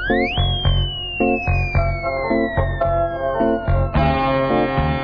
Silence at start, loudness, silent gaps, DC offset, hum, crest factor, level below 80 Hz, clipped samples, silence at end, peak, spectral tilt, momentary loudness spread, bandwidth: 0 s; -19 LUFS; none; under 0.1%; none; 14 dB; -26 dBFS; under 0.1%; 0 s; -6 dBFS; -8.5 dB/octave; 3 LU; 5.4 kHz